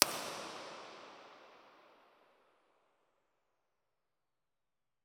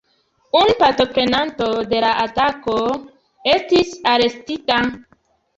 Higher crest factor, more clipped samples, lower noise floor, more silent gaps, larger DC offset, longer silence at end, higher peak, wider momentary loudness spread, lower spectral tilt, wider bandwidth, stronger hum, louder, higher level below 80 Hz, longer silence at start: first, 44 dB vs 16 dB; neither; first, under -90 dBFS vs -62 dBFS; neither; neither; first, 3.25 s vs 0.55 s; about the same, -2 dBFS vs -2 dBFS; first, 21 LU vs 7 LU; second, 0 dB/octave vs -4.5 dB/octave; first, 17 kHz vs 8 kHz; neither; second, -40 LUFS vs -17 LUFS; second, -84 dBFS vs -48 dBFS; second, 0 s vs 0.55 s